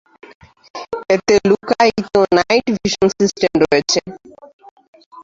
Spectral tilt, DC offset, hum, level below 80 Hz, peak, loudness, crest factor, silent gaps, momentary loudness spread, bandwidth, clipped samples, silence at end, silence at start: -4 dB/octave; under 0.1%; none; -48 dBFS; -2 dBFS; -15 LUFS; 16 dB; 4.53-4.59 s, 4.71-4.77 s, 4.88-4.93 s, 5.06-5.11 s; 14 LU; 7.8 kHz; under 0.1%; 0 s; 0.75 s